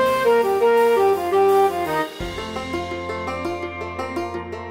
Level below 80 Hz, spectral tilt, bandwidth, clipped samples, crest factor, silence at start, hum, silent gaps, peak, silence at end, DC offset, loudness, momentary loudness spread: -46 dBFS; -5 dB/octave; 16 kHz; under 0.1%; 14 dB; 0 s; none; none; -6 dBFS; 0 s; 0.1%; -21 LUFS; 12 LU